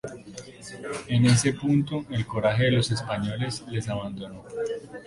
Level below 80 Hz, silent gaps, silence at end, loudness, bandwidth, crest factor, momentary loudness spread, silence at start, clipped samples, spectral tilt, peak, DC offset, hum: -52 dBFS; none; 0 s; -26 LUFS; 11.5 kHz; 18 dB; 18 LU; 0.05 s; under 0.1%; -5.5 dB/octave; -8 dBFS; under 0.1%; none